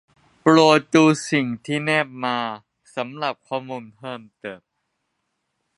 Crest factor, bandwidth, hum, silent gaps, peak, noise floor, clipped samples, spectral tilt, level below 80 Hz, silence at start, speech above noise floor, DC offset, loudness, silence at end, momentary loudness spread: 22 dB; 11.5 kHz; none; none; 0 dBFS; -75 dBFS; under 0.1%; -5 dB/octave; -70 dBFS; 0.45 s; 55 dB; under 0.1%; -20 LUFS; 1.2 s; 20 LU